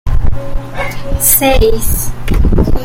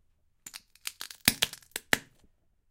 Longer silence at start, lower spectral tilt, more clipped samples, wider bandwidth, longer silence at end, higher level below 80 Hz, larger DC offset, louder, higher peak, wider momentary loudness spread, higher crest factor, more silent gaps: second, 0.05 s vs 0.45 s; first, -4.5 dB/octave vs -1 dB/octave; first, 0.1% vs under 0.1%; about the same, 17.5 kHz vs 17 kHz; second, 0 s vs 0.7 s; first, -14 dBFS vs -60 dBFS; neither; first, -13 LUFS vs -30 LUFS; about the same, 0 dBFS vs -2 dBFS; second, 13 LU vs 21 LU; second, 10 dB vs 34 dB; neither